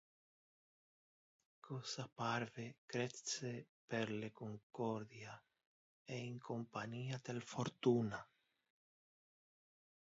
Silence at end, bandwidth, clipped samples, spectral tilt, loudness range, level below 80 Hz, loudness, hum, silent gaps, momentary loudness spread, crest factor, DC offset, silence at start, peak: 1.95 s; 7.6 kHz; under 0.1%; -5 dB/octave; 4 LU; -82 dBFS; -45 LUFS; none; 2.78-2.88 s, 3.69-3.88 s, 4.63-4.70 s, 5.66-6.05 s; 13 LU; 22 dB; under 0.1%; 1.65 s; -24 dBFS